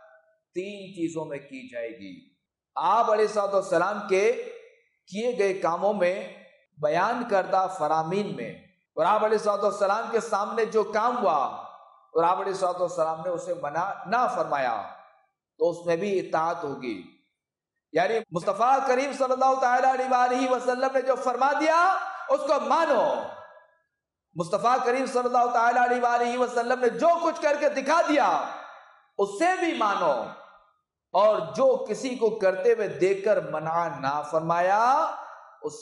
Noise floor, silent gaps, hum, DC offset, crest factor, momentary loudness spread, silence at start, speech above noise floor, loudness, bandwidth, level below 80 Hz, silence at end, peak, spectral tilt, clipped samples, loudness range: -86 dBFS; none; none; under 0.1%; 14 dB; 14 LU; 0.55 s; 62 dB; -25 LUFS; 11.5 kHz; -76 dBFS; 0 s; -12 dBFS; -4.5 dB/octave; under 0.1%; 5 LU